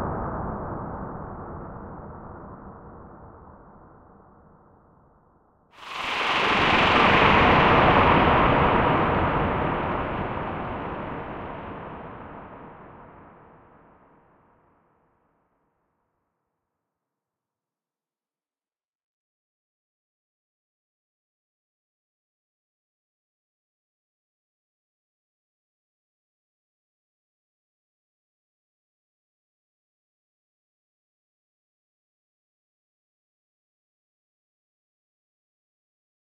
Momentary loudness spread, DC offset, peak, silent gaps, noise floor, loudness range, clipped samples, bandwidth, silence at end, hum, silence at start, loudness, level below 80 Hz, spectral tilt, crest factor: 25 LU; under 0.1%; -4 dBFS; none; under -90 dBFS; 23 LU; under 0.1%; 11 kHz; 23.2 s; none; 0 s; -21 LUFS; -44 dBFS; -6.5 dB/octave; 24 dB